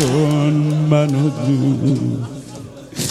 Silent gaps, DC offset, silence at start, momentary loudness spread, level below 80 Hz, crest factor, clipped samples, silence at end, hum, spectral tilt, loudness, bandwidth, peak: none; under 0.1%; 0 s; 16 LU; -50 dBFS; 14 dB; under 0.1%; 0 s; none; -6.5 dB/octave; -17 LUFS; 14 kHz; -2 dBFS